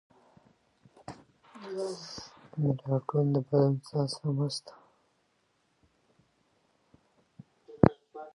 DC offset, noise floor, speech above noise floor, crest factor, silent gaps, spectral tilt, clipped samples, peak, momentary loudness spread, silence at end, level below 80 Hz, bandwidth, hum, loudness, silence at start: under 0.1%; -73 dBFS; 43 dB; 30 dB; none; -7.5 dB/octave; under 0.1%; -4 dBFS; 22 LU; 0.05 s; -56 dBFS; 11.5 kHz; none; -30 LUFS; 1.1 s